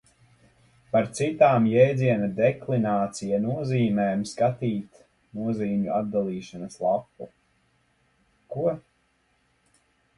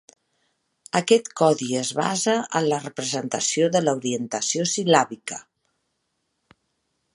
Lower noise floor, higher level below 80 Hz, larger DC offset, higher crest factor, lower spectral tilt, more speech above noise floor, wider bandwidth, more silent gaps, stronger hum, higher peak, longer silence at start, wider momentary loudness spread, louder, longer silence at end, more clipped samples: second, -68 dBFS vs -75 dBFS; first, -62 dBFS vs -72 dBFS; neither; about the same, 20 dB vs 24 dB; first, -7 dB/octave vs -3.5 dB/octave; second, 44 dB vs 53 dB; about the same, 11.5 kHz vs 11.5 kHz; neither; neither; second, -6 dBFS vs -2 dBFS; about the same, 0.95 s vs 0.95 s; first, 16 LU vs 8 LU; second, -25 LUFS vs -22 LUFS; second, 1.4 s vs 1.75 s; neither